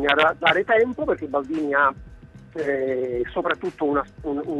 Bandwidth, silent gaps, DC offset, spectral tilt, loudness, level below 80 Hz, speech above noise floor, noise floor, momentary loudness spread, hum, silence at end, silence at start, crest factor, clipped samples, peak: 10.5 kHz; none; under 0.1%; -6 dB/octave; -22 LUFS; -48 dBFS; 22 dB; -44 dBFS; 11 LU; none; 0 s; 0 s; 18 dB; under 0.1%; -4 dBFS